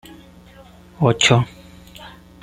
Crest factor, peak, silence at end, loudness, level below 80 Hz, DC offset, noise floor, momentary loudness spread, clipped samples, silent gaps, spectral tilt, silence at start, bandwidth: 22 dB; 0 dBFS; 0.35 s; -17 LUFS; -48 dBFS; under 0.1%; -45 dBFS; 25 LU; under 0.1%; none; -4.5 dB/octave; 1 s; 13 kHz